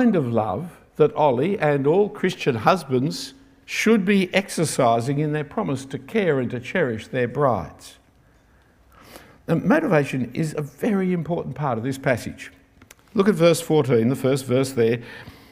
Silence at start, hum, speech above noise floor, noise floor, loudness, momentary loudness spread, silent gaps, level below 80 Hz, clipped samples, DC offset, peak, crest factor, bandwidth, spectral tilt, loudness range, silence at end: 0 s; none; 35 dB; -56 dBFS; -22 LUFS; 10 LU; none; -58 dBFS; under 0.1%; under 0.1%; -2 dBFS; 20 dB; 16 kHz; -6 dB/octave; 4 LU; 0.2 s